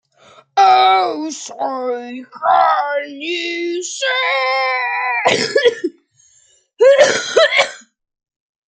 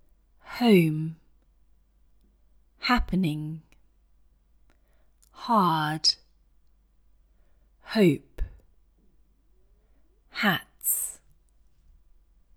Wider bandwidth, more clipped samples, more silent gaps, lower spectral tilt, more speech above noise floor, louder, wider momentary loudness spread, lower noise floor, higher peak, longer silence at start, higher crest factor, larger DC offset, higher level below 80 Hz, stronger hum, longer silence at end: second, 9.4 kHz vs over 20 kHz; neither; neither; second, -1.5 dB/octave vs -4.5 dB/octave; about the same, 39 dB vs 38 dB; first, -15 LUFS vs -25 LUFS; second, 13 LU vs 20 LU; second, -55 dBFS vs -62 dBFS; first, 0 dBFS vs -8 dBFS; about the same, 0.55 s vs 0.45 s; second, 16 dB vs 22 dB; neither; second, -68 dBFS vs -46 dBFS; neither; second, 0.9 s vs 1.4 s